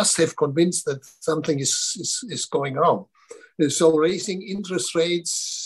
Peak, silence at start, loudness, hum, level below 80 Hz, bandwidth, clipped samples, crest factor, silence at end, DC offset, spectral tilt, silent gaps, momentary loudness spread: -6 dBFS; 0 s; -22 LUFS; none; -68 dBFS; 12.5 kHz; under 0.1%; 18 dB; 0 s; under 0.1%; -3.5 dB/octave; none; 9 LU